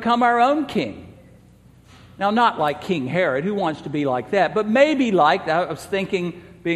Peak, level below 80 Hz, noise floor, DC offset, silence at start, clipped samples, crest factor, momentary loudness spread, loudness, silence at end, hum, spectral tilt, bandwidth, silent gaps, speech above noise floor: -2 dBFS; -58 dBFS; -50 dBFS; under 0.1%; 0 s; under 0.1%; 18 dB; 9 LU; -20 LUFS; 0 s; none; -6 dB/octave; 13.5 kHz; none; 30 dB